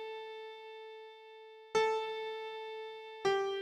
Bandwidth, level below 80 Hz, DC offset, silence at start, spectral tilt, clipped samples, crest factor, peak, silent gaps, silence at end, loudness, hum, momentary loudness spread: 11 kHz; -80 dBFS; under 0.1%; 0 s; -3 dB/octave; under 0.1%; 20 dB; -18 dBFS; none; 0 s; -37 LUFS; none; 20 LU